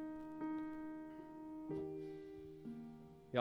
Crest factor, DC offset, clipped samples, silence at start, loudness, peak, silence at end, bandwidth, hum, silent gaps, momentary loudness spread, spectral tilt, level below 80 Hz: 26 dB; under 0.1%; under 0.1%; 0 s; -49 LUFS; -20 dBFS; 0 s; 6.4 kHz; none; none; 8 LU; -8 dB/octave; -72 dBFS